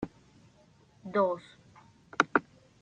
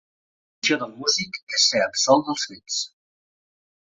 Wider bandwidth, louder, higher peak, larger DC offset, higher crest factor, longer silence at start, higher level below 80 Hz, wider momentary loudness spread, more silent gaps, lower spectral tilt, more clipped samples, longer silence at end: first, 9 kHz vs 8 kHz; second, -31 LUFS vs -22 LUFS; about the same, -6 dBFS vs -4 dBFS; neither; first, 30 dB vs 22 dB; second, 0 s vs 0.65 s; about the same, -68 dBFS vs -70 dBFS; first, 16 LU vs 9 LU; second, none vs 1.43-1.47 s; first, -5 dB/octave vs -1.5 dB/octave; neither; second, 0.4 s vs 1.1 s